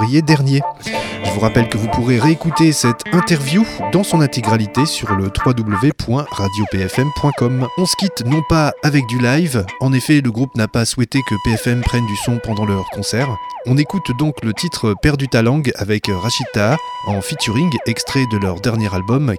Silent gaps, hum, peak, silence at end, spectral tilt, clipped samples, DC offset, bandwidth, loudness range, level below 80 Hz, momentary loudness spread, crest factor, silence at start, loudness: none; none; 0 dBFS; 0 s; -5.5 dB/octave; under 0.1%; under 0.1%; 17.5 kHz; 3 LU; -36 dBFS; 6 LU; 16 dB; 0 s; -16 LUFS